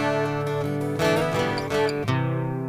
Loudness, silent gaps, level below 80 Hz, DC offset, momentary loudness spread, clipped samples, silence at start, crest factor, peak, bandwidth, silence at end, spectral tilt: -24 LUFS; none; -50 dBFS; under 0.1%; 4 LU; under 0.1%; 0 s; 16 dB; -8 dBFS; 15.5 kHz; 0 s; -6 dB/octave